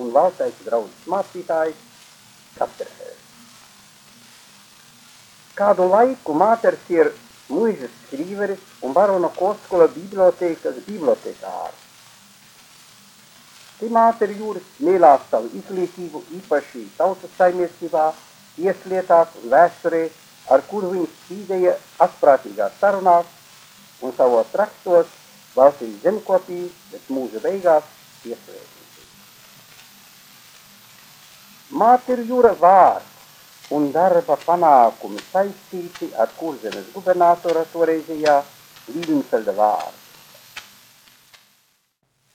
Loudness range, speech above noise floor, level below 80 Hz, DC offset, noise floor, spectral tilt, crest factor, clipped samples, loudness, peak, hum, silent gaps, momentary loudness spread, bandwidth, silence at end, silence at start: 9 LU; 49 dB; -68 dBFS; under 0.1%; -67 dBFS; -5.5 dB/octave; 20 dB; under 0.1%; -19 LUFS; 0 dBFS; none; none; 17 LU; 18 kHz; 1.75 s; 0 s